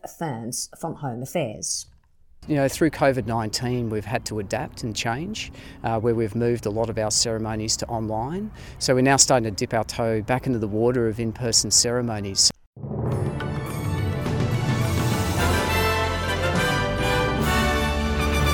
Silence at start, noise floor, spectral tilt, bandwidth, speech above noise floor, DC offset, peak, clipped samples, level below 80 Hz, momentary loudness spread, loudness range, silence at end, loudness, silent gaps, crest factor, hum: 0.05 s; -52 dBFS; -4 dB/octave; 18 kHz; 28 dB; under 0.1%; -4 dBFS; under 0.1%; -38 dBFS; 11 LU; 5 LU; 0 s; -23 LUFS; 12.66-12.73 s; 20 dB; none